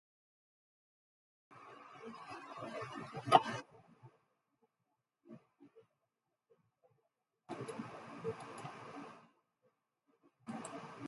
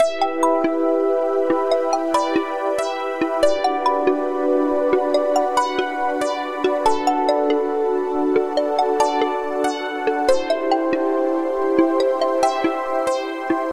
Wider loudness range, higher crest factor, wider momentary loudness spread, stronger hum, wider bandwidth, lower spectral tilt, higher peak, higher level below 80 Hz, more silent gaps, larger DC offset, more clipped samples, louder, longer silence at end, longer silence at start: first, 14 LU vs 1 LU; first, 34 dB vs 16 dB; first, 29 LU vs 4 LU; neither; second, 11.5 kHz vs 14 kHz; about the same, -4.5 dB/octave vs -3.5 dB/octave; second, -10 dBFS vs -2 dBFS; second, -84 dBFS vs -54 dBFS; neither; neither; neither; second, -40 LUFS vs -20 LUFS; about the same, 0 s vs 0 s; first, 1.5 s vs 0 s